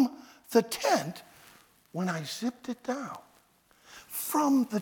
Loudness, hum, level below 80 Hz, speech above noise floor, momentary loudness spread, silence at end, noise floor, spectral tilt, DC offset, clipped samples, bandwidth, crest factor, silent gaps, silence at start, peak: -30 LUFS; none; -76 dBFS; 35 dB; 21 LU; 0 s; -64 dBFS; -4.5 dB/octave; under 0.1%; under 0.1%; over 20 kHz; 20 dB; none; 0 s; -10 dBFS